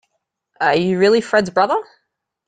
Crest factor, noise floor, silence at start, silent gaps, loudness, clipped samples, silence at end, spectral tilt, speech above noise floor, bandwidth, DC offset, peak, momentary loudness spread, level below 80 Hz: 16 dB; -73 dBFS; 0.6 s; none; -16 LUFS; under 0.1%; 0.65 s; -5.5 dB/octave; 57 dB; 9.4 kHz; under 0.1%; -2 dBFS; 6 LU; -58 dBFS